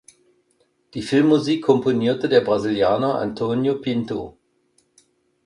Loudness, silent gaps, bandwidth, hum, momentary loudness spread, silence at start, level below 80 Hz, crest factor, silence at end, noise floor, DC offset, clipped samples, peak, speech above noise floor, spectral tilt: -20 LUFS; none; 11 kHz; none; 12 LU; 0.95 s; -56 dBFS; 18 dB; 1.15 s; -65 dBFS; under 0.1%; under 0.1%; -2 dBFS; 46 dB; -6.5 dB/octave